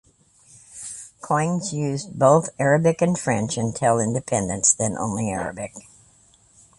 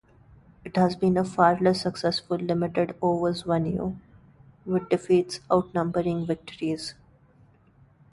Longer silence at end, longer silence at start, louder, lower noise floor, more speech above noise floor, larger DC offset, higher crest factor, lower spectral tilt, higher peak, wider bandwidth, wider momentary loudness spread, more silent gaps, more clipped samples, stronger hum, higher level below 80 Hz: second, 1 s vs 1.2 s; about the same, 0.7 s vs 0.65 s; first, -21 LUFS vs -26 LUFS; about the same, -56 dBFS vs -58 dBFS; about the same, 35 dB vs 33 dB; neither; about the same, 20 dB vs 22 dB; second, -5 dB/octave vs -6.5 dB/octave; about the same, -2 dBFS vs -4 dBFS; about the same, 11.5 kHz vs 11.5 kHz; first, 17 LU vs 10 LU; neither; neither; neither; about the same, -54 dBFS vs -56 dBFS